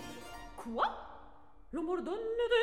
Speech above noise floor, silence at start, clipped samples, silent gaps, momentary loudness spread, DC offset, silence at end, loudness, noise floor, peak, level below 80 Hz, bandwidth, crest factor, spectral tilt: 25 dB; 0 s; under 0.1%; none; 13 LU; 0.2%; 0 s; -37 LUFS; -59 dBFS; -18 dBFS; -58 dBFS; 15 kHz; 18 dB; -4 dB/octave